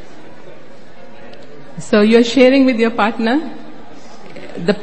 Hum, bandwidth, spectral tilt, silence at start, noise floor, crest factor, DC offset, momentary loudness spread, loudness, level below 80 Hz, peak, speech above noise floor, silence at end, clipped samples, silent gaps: none; 8.8 kHz; -5.5 dB/octave; 0.45 s; -40 dBFS; 16 dB; 5%; 25 LU; -13 LUFS; -56 dBFS; 0 dBFS; 28 dB; 0 s; under 0.1%; none